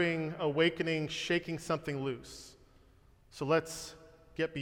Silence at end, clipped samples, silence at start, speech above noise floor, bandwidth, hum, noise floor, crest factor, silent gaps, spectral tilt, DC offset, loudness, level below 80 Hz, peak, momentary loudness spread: 0 s; under 0.1%; 0 s; 29 dB; 17 kHz; none; -62 dBFS; 18 dB; none; -5 dB/octave; under 0.1%; -34 LUFS; -64 dBFS; -16 dBFS; 19 LU